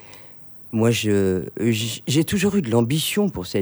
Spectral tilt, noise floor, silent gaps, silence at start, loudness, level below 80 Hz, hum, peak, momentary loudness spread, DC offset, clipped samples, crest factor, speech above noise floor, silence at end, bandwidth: -5 dB/octave; -42 dBFS; none; 0 s; -21 LUFS; -52 dBFS; none; -6 dBFS; 17 LU; under 0.1%; under 0.1%; 16 dB; 22 dB; 0 s; over 20 kHz